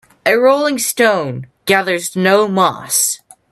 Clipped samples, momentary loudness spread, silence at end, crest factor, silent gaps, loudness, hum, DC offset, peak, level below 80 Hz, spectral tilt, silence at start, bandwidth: under 0.1%; 7 LU; 0.35 s; 14 dB; none; -14 LUFS; none; under 0.1%; 0 dBFS; -62 dBFS; -3 dB/octave; 0.25 s; 14.5 kHz